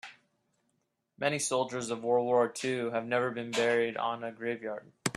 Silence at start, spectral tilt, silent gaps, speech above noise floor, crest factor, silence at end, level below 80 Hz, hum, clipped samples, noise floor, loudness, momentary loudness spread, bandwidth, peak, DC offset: 0.05 s; -3.5 dB/octave; none; 48 dB; 20 dB; 0.05 s; -78 dBFS; none; under 0.1%; -79 dBFS; -31 LUFS; 9 LU; 13.5 kHz; -12 dBFS; under 0.1%